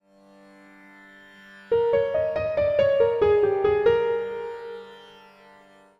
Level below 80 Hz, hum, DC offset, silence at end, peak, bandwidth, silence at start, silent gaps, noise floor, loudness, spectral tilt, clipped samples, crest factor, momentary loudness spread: -56 dBFS; none; under 0.1%; 0.95 s; -8 dBFS; 6 kHz; 1.55 s; none; -53 dBFS; -23 LUFS; -7 dB/octave; under 0.1%; 18 dB; 16 LU